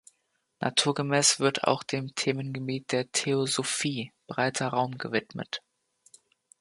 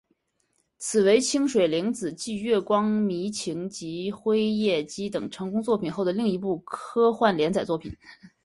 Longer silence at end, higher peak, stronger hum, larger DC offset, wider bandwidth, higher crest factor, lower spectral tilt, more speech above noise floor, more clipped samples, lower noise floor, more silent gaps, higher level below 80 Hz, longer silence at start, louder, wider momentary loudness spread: first, 1 s vs 0.2 s; about the same, -6 dBFS vs -6 dBFS; neither; neither; about the same, 11.5 kHz vs 11.5 kHz; first, 24 dB vs 18 dB; second, -3 dB/octave vs -5 dB/octave; about the same, 47 dB vs 47 dB; neither; about the same, -75 dBFS vs -72 dBFS; neither; second, -72 dBFS vs -60 dBFS; second, 0.6 s vs 0.8 s; second, -28 LUFS vs -25 LUFS; about the same, 13 LU vs 11 LU